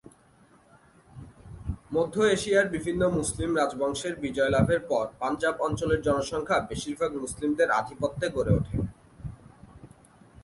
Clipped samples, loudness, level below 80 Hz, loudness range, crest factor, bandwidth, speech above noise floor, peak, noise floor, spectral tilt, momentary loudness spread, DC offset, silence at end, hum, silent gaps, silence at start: under 0.1%; -27 LUFS; -46 dBFS; 3 LU; 20 dB; 11.5 kHz; 32 dB; -8 dBFS; -59 dBFS; -5.5 dB/octave; 14 LU; under 0.1%; 0.55 s; none; none; 1.15 s